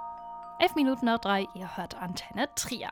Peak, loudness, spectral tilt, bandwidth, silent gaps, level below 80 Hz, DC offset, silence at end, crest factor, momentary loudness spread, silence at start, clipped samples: -12 dBFS; -30 LUFS; -3.5 dB/octave; over 20 kHz; none; -60 dBFS; under 0.1%; 0 s; 20 dB; 14 LU; 0 s; under 0.1%